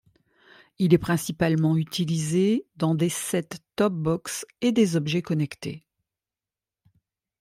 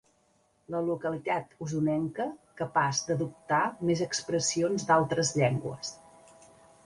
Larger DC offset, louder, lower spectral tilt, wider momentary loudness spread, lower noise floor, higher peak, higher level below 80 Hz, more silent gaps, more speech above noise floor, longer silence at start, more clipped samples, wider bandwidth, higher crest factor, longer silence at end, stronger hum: neither; first, -25 LUFS vs -30 LUFS; first, -6 dB/octave vs -4.5 dB/octave; about the same, 9 LU vs 11 LU; first, under -90 dBFS vs -69 dBFS; first, -6 dBFS vs -10 dBFS; first, -58 dBFS vs -66 dBFS; neither; first, over 66 dB vs 39 dB; about the same, 0.8 s vs 0.7 s; neither; first, 15.5 kHz vs 11.5 kHz; about the same, 20 dB vs 20 dB; first, 1.6 s vs 0.9 s; neither